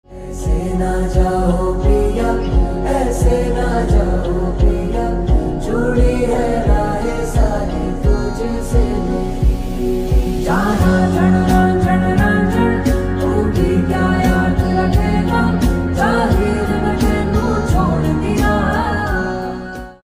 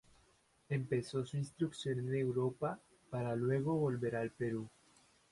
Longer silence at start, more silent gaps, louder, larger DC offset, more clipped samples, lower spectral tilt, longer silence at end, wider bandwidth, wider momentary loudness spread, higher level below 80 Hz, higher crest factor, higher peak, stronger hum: second, 0.1 s vs 0.7 s; neither; first, -16 LUFS vs -38 LUFS; neither; neither; about the same, -7 dB/octave vs -7.5 dB/octave; second, 0.15 s vs 0.65 s; first, 15.5 kHz vs 11.5 kHz; about the same, 6 LU vs 7 LU; first, -20 dBFS vs -70 dBFS; about the same, 14 dB vs 14 dB; first, 0 dBFS vs -24 dBFS; neither